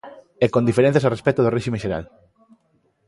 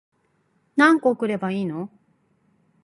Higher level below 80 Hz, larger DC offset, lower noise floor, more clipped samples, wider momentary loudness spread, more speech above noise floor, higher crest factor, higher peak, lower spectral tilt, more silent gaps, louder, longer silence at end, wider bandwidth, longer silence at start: first, -50 dBFS vs -72 dBFS; neither; about the same, -65 dBFS vs -67 dBFS; neither; second, 10 LU vs 15 LU; about the same, 45 dB vs 46 dB; about the same, 18 dB vs 20 dB; about the same, -4 dBFS vs -4 dBFS; about the same, -7.5 dB/octave vs -6.5 dB/octave; neither; about the same, -20 LUFS vs -21 LUFS; about the same, 1.05 s vs 0.95 s; about the same, 11.5 kHz vs 11.5 kHz; second, 0.05 s vs 0.75 s